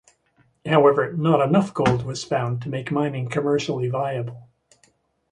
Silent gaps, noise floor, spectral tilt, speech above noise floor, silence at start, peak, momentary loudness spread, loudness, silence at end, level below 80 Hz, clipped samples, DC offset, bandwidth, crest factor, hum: none; -63 dBFS; -6.5 dB/octave; 42 dB; 0.65 s; -4 dBFS; 10 LU; -22 LUFS; 0.9 s; -54 dBFS; under 0.1%; under 0.1%; 11 kHz; 20 dB; none